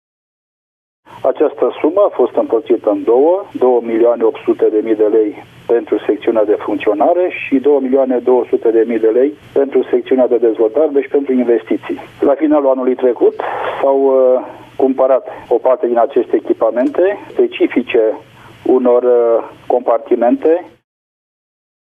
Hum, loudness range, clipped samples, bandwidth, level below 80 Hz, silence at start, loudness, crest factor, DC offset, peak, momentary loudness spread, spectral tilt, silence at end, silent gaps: none; 1 LU; under 0.1%; 3.7 kHz; -60 dBFS; 1.1 s; -14 LUFS; 12 dB; under 0.1%; 0 dBFS; 5 LU; -7.5 dB/octave; 1.2 s; none